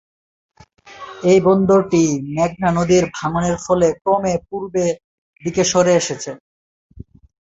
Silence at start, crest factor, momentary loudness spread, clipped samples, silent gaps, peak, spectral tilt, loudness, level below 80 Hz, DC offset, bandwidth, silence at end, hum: 0.85 s; 16 dB; 15 LU; under 0.1%; 5.04-5.33 s, 6.40-6.90 s; -2 dBFS; -5.5 dB/octave; -17 LUFS; -48 dBFS; under 0.1%; 8 kHz; 0.45 s; none